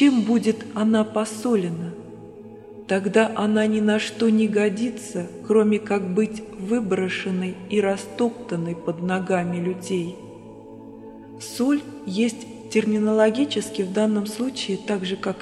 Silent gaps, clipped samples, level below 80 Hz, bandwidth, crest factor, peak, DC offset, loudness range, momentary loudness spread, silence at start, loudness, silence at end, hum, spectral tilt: none; under 0.1%; -62 dBFS; 12.5 kHz; 18 dB; -4 dBFS; under 0.1%; 6 LU; 20 LU; 0 s; -23 LUFS; 0 s; none; -5.5 dB/octave